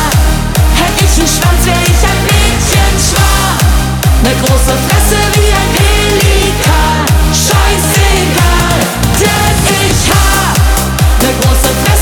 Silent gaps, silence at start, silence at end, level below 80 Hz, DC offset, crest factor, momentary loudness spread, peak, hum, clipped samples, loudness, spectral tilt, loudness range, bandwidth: none; 0 s; 0 s; -12 dBFS; under 0.1%; 8 dB; 2 LU; 0 dBFS; none; under 0.1%; -9 LUFS; -4 dB/octave; 0 LU; 20 kHz